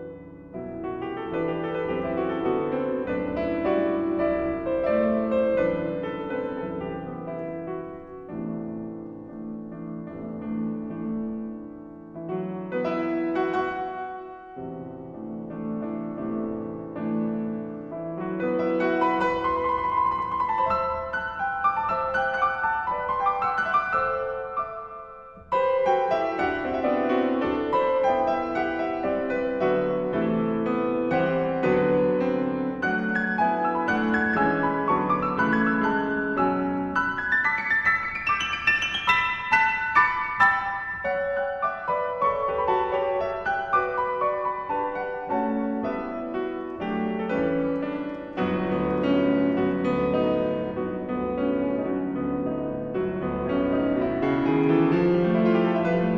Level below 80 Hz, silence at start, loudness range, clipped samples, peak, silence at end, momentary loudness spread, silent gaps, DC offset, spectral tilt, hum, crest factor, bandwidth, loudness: -52 dBFS; 0 s; 9 LU; under 0.1%; -6 dBFS; 0 s; 13 LU; none; under 0.1%; -7 dB/octave; none; 20 dB; 7.6 kHz; -25 LUFS